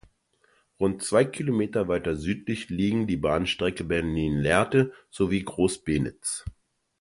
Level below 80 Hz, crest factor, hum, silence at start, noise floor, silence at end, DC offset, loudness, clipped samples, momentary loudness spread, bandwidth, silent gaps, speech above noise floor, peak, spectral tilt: -46 dBFS; 22 dB; none; 0.8 s; -66 dBFS; 0.5 s; under 0.1%; -26 LUFS; under 0.1%; 7 LU; 11.5 kHz; none; 41 dB; -4 dBFS; -5.5 dB/octave